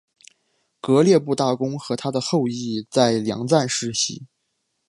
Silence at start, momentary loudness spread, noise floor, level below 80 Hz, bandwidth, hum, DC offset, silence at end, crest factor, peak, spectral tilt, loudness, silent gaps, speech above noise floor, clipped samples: 0.85 s; 9 LU; -74 dBFS; -64 dBFS; 11.5 kHz; none; under 0.1%; 0.65 s; 20 dB; -2 dBFS; -5 dB/octave; -21 LUFS; none; 54 dB; under 0.1%